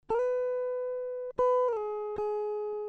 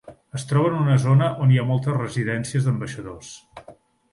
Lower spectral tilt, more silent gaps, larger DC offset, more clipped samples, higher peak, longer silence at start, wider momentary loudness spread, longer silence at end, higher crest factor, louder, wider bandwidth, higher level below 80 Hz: about the same, -6 dB/octave vs -7 dB/octave; neither; neither; neither; second, -20 dBFS vs -8 dBFS; about the same, 0.1 s vs 0.1 s; second, 8 LU vs 18 LU; second, 0 s vs 0.4 s; about the same, 12 dB vs 14 dB; second, -31 LUFS vs -21 LUFS; second, 6.4 kHz vs 11.5 kHz; second, -64 dBFS vs -56 dBFS